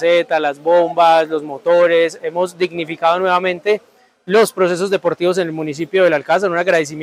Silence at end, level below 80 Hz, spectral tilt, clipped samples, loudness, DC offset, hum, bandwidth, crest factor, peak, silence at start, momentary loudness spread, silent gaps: 0 s; -68 dBFS; -4.5 dB/octave; under 0.1%; -16 LUFS; under 0.1%; none; 15 kHz; 14 dB; 0 dBFS; 0 s; 8 LU; none